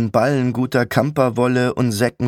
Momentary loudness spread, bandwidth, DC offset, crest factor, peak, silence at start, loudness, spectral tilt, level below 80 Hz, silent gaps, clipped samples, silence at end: 2 LU; 17 kHz; under 0.1%; 16 dB; -2 dBFS; 0 s; -18 LUFS; -6.5 dB/octave; -54 dBFS; none; under 0.1%; 0 s